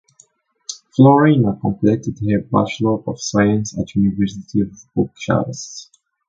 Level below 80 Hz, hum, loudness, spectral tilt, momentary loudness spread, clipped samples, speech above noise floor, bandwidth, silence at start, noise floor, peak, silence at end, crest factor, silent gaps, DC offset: -46 dBFS; none; -17 LUFS; -6.5 dB/octave; 16 LU; under 0.1%; 38 dB; 7.8 kHz; 0.7 s; -54 dBFS; 0 dBFS; 0.45 s; 18 dB; none; under 0.1%